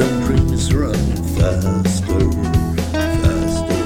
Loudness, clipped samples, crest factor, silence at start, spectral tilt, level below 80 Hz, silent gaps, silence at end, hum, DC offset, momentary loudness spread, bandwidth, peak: -18 LUFS; under 0.1%; 14 dB; 0 s; -6.5 dB/octave; -24 dBFS; none; 0 s; none; under 0.1%; 3 LU; 16.5 kHz; -2 dBFS